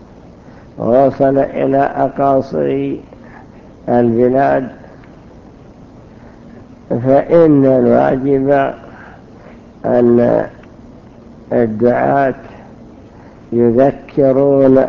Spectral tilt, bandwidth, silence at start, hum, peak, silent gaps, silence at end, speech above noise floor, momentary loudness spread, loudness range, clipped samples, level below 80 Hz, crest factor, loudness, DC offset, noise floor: -10 dB/octave; 6.4 kHz; 0.75 s; none; 0 dBFS; none; 0 s; 26 dB; 12 LU; 5 LU; under 0.1%; -44 dBFS; 14 dB; -13 LUFS; under 0.1%; -38 dBFS